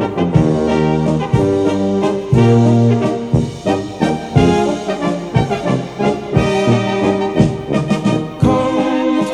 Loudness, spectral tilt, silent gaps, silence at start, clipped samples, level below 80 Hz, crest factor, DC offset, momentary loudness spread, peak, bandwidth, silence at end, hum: -15 LUFS; -7.5 dB/octave; none; 0 s; under 0.1%; -34 dBFS; 14 dB; under 0.1%; 6 LU; 0 dBFS; 10.5 kHz; 0 s; none